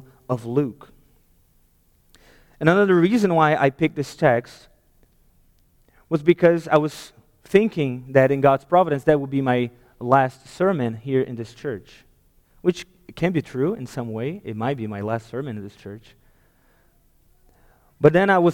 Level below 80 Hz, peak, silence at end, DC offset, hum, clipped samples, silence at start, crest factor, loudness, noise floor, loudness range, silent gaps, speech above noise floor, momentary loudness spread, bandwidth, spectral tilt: -56 dBFS; -2 dBFS; 0 s; under 0.1%; none; under 0.1%; 0.3 s; 20 dB; -21 LUFS; -60 dBFS; 9 LU; none; 40 dB; 15 LU; 16.5 kHz; -7.5 dB/octave